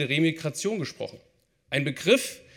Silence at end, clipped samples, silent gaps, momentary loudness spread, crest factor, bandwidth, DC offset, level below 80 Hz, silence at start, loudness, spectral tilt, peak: 0.2 s; under 0.1%; none; 13 LU; 20 dB; 18.5 kHz; under 0.1%; -70 dBFS; 0 s; -26 LUFS; -4.5 dB/octave; -8 dBFS